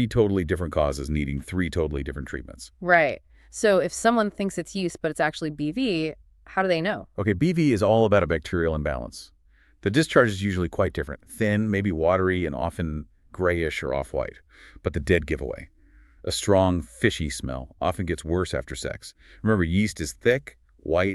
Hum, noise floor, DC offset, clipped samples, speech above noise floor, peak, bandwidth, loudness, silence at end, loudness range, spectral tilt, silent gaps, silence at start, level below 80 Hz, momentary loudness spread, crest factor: none; -54 dBFS; under 0.1%; under 0.1%; 29 dB; -2 dBFS; 13.5 kHz; -25 LUFS; 0 s; 3 LU; -5.5 dB/octave; none; 0 s; -40 dBFS; 13 LU; 22 dB